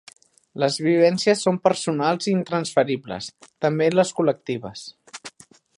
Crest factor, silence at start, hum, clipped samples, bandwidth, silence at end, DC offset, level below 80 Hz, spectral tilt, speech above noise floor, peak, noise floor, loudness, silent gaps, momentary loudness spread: 20 dB; 0.55 s; none; under 0.1%; 11.5 kHz; 0.5 s; under 0.1%; -66 dBFS; -5 dB/octave; 28 dB; -2 dBFS; -49 dBFS; -21 LUFS; none; 20 LU